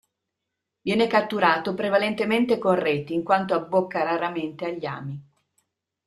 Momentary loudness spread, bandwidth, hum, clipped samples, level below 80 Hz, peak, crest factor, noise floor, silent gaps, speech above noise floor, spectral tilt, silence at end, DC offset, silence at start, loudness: 11 LU; 13 kHz; none; under 0.1%; -68 dBFS; -4 dBFS; 20 dB; -83 dBFS; none; 60 dB; -6.5 dB/octave; 0.85 s; under 0.1%; 0.85 s; -24 LUFS